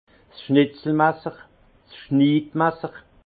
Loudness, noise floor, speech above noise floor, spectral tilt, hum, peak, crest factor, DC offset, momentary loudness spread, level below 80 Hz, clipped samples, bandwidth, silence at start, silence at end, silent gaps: -21 LUFS; -50 dBFS; 30 dB; -11.5 dB/octave; none; -4 dBFS; 18 dB; under 0.1%; 16 LU; -60 dBFS; under 0.1%; 4.8 kHz; 0.4 s; 0.25 s; none